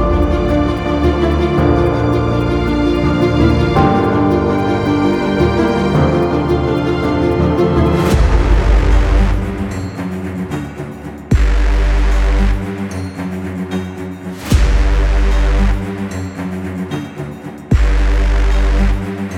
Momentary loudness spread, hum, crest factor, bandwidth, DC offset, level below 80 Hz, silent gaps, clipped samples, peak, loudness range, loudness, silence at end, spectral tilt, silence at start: 10 LU; none; 14 dB; 11 kHz; under 0.1%; -16 dBFS; none; under 0.1%; 0 dBFS; 5 LU; -15 LUFS; 0 s; -7.5 dB/octave; 0 s